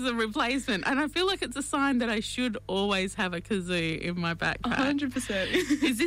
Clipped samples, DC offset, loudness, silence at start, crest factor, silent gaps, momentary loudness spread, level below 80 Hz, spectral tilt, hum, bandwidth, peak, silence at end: under 0.1%; under 0.1%; -28 LUFS; 0 s; 12 dB; none; 4 LU; -50 dBFS; -4 dB/octave; 50 Hz at -50 dBFS; 16 kHz; -16 dBFS; 0 s